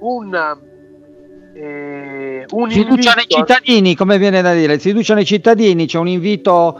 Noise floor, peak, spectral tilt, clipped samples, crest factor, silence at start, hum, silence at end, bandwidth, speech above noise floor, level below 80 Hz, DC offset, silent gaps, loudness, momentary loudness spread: -41 dBFS; 0 dBFS; -5.5 dB/octave; under 0.1%; 14 dB; 0 s; none; 0 s; 11 kHz; 29 dB; -52 dBFS; under 0.1%; none; -12 LUFS; 16 LU